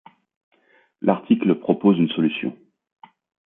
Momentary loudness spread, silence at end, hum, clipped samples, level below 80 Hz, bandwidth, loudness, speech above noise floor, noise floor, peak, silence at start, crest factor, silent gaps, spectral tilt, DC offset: 8 LU; 0.95 s; none; under 0.1%; -68 dBFS; 3.9 kHz; -21 LUFS; 41 dB; -60 dBFS; -2 dBFS; 1.05 s; 20 dB; none; -11.5 dB/octave; under 0.1%